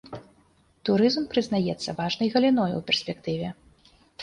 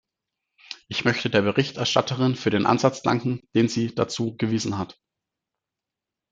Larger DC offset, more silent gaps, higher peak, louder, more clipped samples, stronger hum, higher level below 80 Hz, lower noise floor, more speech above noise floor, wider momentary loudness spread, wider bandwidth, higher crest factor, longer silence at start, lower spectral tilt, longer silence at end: neither; neither; second, -8 dBFS vs -4 dBFS; about the same, -25 LUFS vs -23 LUFS; neither; neither; about the same, -60 dBFS vs -64 dBFS; second, -62 dBFS vs -87 dBFS; second, 37 dB vs 64 dB; first, 11 LU vs 8 LU; first, 11 kHz vs 9.2 kHz; about the same, 18 dB vs 22 dB; second, 0.05 s vs 0.7 s; about the same, -5.5 dB/octave vs -5.5 dB/octave; second, 0 s vs 1.4 s